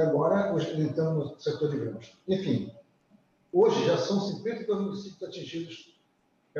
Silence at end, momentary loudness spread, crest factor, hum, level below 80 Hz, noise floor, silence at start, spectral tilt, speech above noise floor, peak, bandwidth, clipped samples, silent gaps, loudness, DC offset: 0 s; 15 LU; 18 dB; none; -70 dBFS; -70 dBFS; 0 s; -7 dB/octave; 41 dB; -12 dBFS; 7.4 kHz; under 0.1%; none; -29 LUFS; under 0.1%